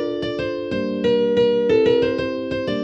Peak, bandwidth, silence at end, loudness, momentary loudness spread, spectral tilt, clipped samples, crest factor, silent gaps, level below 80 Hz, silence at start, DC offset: -6 dBFS; 7.4 kHz; 0 s; -20 LUFS; 8 LU; -7 dB/octave; under 0.1%; 14 dB; none; -48 dBFS; 0 s; under 0.1%